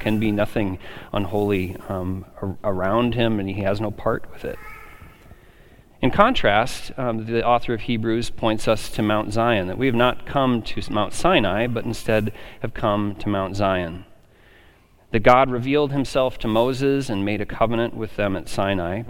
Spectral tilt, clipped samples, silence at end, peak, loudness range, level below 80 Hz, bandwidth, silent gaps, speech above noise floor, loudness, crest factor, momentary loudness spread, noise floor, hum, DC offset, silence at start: -6 dB/octave; under 0.1%; 0 s; 0 dBFS; 4 LU; -38 dBFS; 17 kHz; none; 31 dB; -22 LUFS; 22 dB; 10 LU; -53 dBFS; none; under 0.1%; 0 s